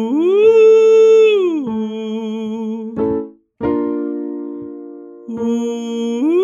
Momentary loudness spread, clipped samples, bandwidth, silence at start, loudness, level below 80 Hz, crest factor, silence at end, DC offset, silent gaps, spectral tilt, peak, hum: 21 LU; under 0.1%; 7.4 kHz; 0 s; -15 LUFS; -54 dBFS; 12 dB; 0 s; under 0.1%; none; -6 dB/octave; -2 dBFS; none